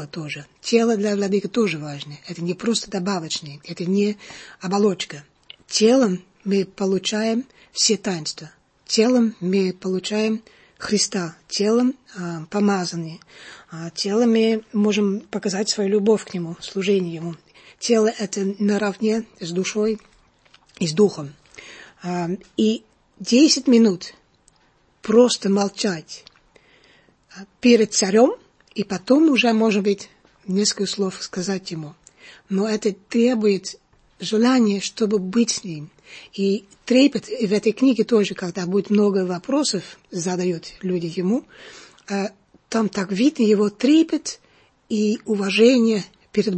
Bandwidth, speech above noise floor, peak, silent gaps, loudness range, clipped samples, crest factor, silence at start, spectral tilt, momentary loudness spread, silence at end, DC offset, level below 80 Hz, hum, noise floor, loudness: 8.8 kHz; 40 dB; -2 dBFS; none; 5 LU; under 0.1%; 18 dB; 0 s; -4.5 dB/octave; 17 LU; 0 s; under 0.1%; -64 dBFS; none; -60 dBFS; -21 LUFS